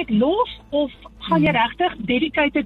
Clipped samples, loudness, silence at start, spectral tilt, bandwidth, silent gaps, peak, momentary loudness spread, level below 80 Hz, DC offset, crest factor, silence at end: under 0.1%; -20 LUFS; 0 s; -8 dB/octave; 5.2 kHz; none; -6 dBFS; 6 LU; -46 dBFS; under 0.1%; 14 dB; 0 s